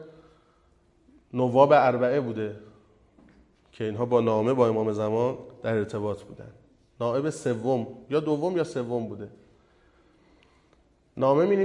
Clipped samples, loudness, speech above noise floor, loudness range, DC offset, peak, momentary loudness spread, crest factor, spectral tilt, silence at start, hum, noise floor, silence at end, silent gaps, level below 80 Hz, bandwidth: under 0.1%; -26 LUFS; 38 dB; 5 LU; under 0.1%; -4 dBFS; 16 LU; 22 dB; -7.5 dB/octave; 0 s; none; -63 dBFS; 0 s; none; -64 dBFS; 11 kHz